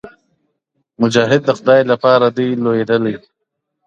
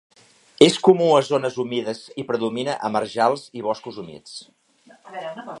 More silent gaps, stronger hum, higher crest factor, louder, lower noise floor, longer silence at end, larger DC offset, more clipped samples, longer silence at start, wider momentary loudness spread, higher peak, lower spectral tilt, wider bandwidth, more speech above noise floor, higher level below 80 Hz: neither; neither; second, 16 dB vs 22 dB; first, -14 LUFS vs -20 LUFS; first, -75 dBFS vs -49 dBFS; first, 0.7 s vs 0 s; neither; neither; second, 0.05 s vs 0.6 s; second, 7 LU vs 21 LU; about the same, 0 dBFS vs 0 dBFS; about the same, -6 dB/octave vs -5 dB/octave; second, 8.6 kHz vs 11.5 kHz; first, 61 dB vs 28 dB; first, -60 dBFS vs -68 dBFS